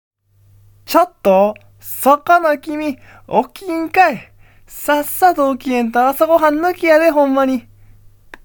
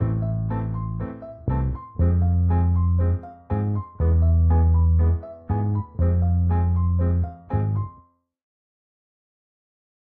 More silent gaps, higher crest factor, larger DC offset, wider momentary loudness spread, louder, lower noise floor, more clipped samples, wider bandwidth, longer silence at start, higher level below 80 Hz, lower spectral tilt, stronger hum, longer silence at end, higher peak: neither; about the same, 16 dB vs 12 dB; neither; about the same, 12 LU vs 10 LU; first, -15 LUFS vs -23 LUFS; second, -51 dBFS vs -55 dBFS; neither; first, 19.5 kHz vs 2.5 kHz; first, 0.9 s vs 0 s; second, -50 dBFS vs -28 dBFS; second, -4.5 dB/octave vs -14 dB/octave; neither; second, 0.85 s vs 2.1 s; first, 0 dBFS vs -10 dBFS